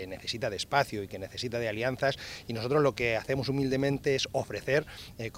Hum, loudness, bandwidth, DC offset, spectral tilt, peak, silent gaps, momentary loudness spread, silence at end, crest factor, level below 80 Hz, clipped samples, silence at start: none; -30 LUFS; 16 kHz; under 0.1%; -5 dB/octave; -10 dBFS; none; 11 LU; 0 s; 22 dB; -56 dBFS; under 0.1%; 0 s